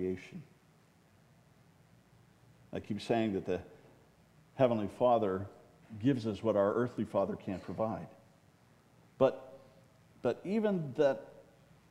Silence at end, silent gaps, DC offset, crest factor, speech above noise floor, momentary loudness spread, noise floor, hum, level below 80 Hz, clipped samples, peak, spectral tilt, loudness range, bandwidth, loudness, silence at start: 0.5 s; none; under 0.1%; 22 dB; 33 dB; 20 LU; -65 dBFS; none; -72 dBFS; under 0.1%; -14 dBFS; -7.5 dB/octave; 7 LU; 12.5 kHz; -34 LUFS; 0 s